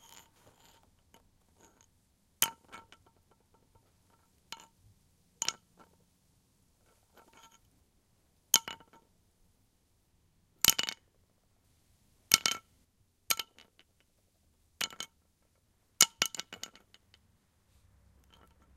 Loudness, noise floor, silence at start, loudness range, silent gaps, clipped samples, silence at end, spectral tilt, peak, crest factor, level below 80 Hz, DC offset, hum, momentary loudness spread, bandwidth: -30 LUFS; -72 dBFS; 2.4 s; 13 LU; none; under 0.1%; 2.2 s; 1 dB/octave; 0 dBFS; 40 dB; -68 dBFS; under 0.1%; none; 24 LU; 16 kHz